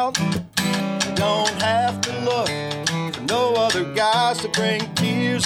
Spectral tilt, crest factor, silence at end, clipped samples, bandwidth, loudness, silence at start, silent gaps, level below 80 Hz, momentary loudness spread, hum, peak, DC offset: -4 dB/octave; 18 dB; 0 s; under 0.1%; 17 kHz; -21 LUFS; 0 s; none; -56 dBFS; 5 LU; none; -4 dBFS; under 0.1%